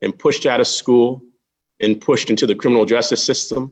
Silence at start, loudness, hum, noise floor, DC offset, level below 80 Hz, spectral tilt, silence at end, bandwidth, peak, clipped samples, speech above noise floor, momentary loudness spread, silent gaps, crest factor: 0 s; -16 LUFS; none; -65 dBFS; under 0.1%; -60 dBFS; -4 dB/octave; 0 s; 9.2 kHz; -2 dBFS; under 0.1%; 49 dB; 5 LU; none; 14 dB